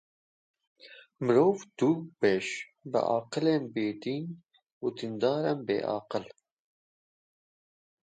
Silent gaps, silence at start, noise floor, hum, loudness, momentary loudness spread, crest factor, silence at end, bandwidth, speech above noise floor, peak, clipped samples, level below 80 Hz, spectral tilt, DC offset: 4.72-4.81 s; 0.85 s; under -90 dBFS; none; -30 LUFS; 11 LU; 20 dB; 1.85 s; 9.2 kHz; over 61 dB; -12 dBFS; under 0.1%; -76 dBFS; -6 dB/octave; under 0.1%